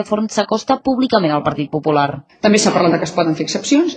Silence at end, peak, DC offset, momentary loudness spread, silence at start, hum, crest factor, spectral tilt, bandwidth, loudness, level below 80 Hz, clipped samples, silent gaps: 0 s; 0 dBFS; under 0.1%; 6 LU; 0 s; none; 16 dB; -4.5 dB/octave; 9.6 kHz; -16 LUFS; -52 dBFS; under 0.1%; none